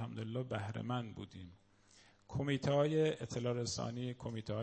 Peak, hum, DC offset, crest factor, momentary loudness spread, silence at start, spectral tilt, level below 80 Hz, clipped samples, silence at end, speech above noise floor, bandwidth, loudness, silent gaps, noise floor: -20 dBFS; none; under 0.1%; 18 dB; 15 LU; 0 s; -6 dB/octave; -66 dBFS; under 0.1%; 0 s; 28 dB; 8.4 kHz; -38 LUFS; none; -66 dBFS